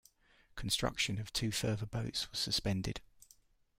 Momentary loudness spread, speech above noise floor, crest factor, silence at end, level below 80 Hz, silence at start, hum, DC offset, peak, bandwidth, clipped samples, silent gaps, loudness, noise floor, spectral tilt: 10 LU; 32 dB; 20 dB; 0.55 s; -54 dBFS; 0.55 s; none; under 0.1%; -20 dBFS; 16 kHz; under 0.1%; none; -36 LUFS; -68 dBFS; -3.5 dB/octave